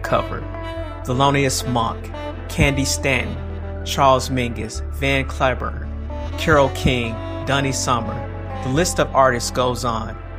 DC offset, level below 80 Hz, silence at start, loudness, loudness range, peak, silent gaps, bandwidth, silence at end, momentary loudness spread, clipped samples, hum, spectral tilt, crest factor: under 0.1%; -32 dBFS; 0 s; -20 LUFS; 2 LU; -2 dBFS; none; 15.5 kHz; 0 s; 13 LU; under 0.1%; none; -4.5 dB/octave; 18 dB